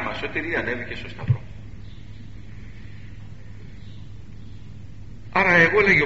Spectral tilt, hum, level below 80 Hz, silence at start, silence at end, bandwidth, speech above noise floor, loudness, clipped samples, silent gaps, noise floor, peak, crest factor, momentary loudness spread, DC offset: -4 dB/octave; none; -46 dBFS; 0 s; 0 s; 7.6 kHz; 20 dB; -21 LUFS; under 0.1%; none; -41 dBFS; -2 dBFS; 22 dB; 27 LU; 1%